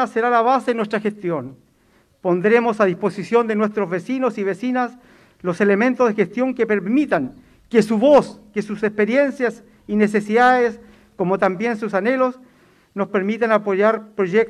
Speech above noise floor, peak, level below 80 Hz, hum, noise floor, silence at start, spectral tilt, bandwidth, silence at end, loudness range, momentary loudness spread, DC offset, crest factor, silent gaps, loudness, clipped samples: 39 dB; -2 dBFS; -60 dBFS; none; -58 dBFS; 0 s; -7 dB/octave; 11.5 kHz; 0 s; 3 LU; 10 LU; under 0.1%; 16 dB; none; -19 LUFS; under 0.1%